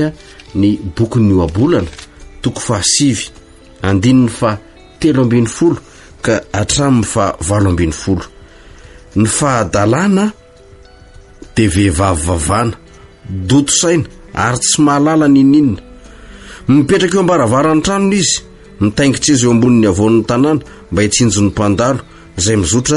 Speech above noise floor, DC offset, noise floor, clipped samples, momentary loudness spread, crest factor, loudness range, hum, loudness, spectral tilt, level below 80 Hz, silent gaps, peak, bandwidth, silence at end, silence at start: 28 dB; under 0.1%; -40 dBFS; under 0.1%; 11 LU; 12 dB; 4 LU; none; -12 LUFS; -5 dB/octave; -34 dBFS; none; 0 dBFS; 11.5 kHz; 0 s; 0 s